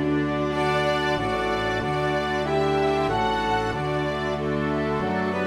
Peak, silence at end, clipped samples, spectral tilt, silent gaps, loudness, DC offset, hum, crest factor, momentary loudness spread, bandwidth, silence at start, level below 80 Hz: -10 dBFS; 0 s; under 0.1%; -6 dB/octave; none; -24 LUFS; under 0.1%; none; 14 dB; 3 LU; 13.5 kHz; 0 s; -42 dBFS